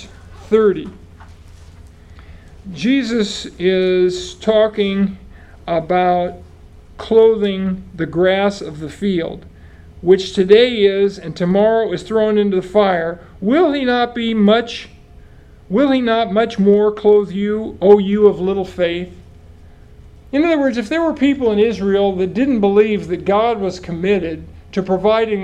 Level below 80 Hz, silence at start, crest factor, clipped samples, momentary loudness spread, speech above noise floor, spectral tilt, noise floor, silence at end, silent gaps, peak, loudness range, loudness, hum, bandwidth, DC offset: -42 dBFS; 0 s; 16 dB; under 0.1%; 11 LU; 27 dB; -6.5 dB/octave; -42 dBFS; 0 s; none; 0 dBFS; 4 LU; -16 LUFS; none; 9 kHz; under 0.1%